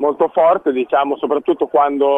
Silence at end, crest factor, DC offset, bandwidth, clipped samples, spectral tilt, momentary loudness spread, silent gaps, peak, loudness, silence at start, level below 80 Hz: 0 s; 12 dB; under 0.1%; 3.8 kHz; under 0.1%; -7.5 dB/octave; 4 LU; none; -2 dBFS; -16 LUFS; 0 s; -62 dBFS